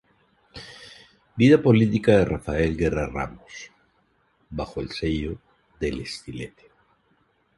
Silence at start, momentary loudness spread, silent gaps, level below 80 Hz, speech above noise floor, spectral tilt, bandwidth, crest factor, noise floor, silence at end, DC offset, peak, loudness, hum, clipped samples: 0.55 s; 24 LU; none; -42 dBFS; 44 dB; -7 dB/octave; 11.5 kHz; 22 dB; -66 dBFS; 1.1 s; under 0.1%; -4 dBFS; -23 LUFS; none; under 0.1%